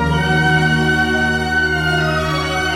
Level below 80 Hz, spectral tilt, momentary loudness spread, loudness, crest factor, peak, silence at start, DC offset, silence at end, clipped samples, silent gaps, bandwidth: -30 dBFS; -5 dB/octave; 4 LU; -15 LUFS; 12 dB; -4 dBFS; 0 s; under 0.1%; 0 s; under 0.1%; none; 14.5 kHz